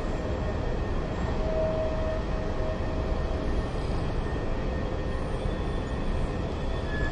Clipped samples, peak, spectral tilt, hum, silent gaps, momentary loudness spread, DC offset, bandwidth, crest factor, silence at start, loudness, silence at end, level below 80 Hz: under 0.1%; -14 dBFS; -7.5 dB/octave; none; none; 3 LU; under 0.1%; 9.8 kHz; 14 dB; 0 s; -31 LUFS; 0 s; -32 dBFS